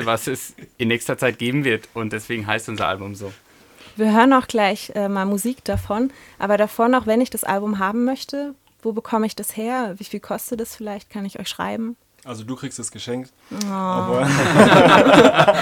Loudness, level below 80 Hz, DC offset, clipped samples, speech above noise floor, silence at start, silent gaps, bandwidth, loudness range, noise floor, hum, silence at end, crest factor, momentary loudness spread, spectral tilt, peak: -19 LUFS; -50 dBFS; under 0.1%; under 0.1%; 28 dB; 0 s; none; 18.5 kHz; 11 LU; -47 dBFS; none; 0 s; 18 dB; 19 LU; -5 dB/octave; 0 dBFS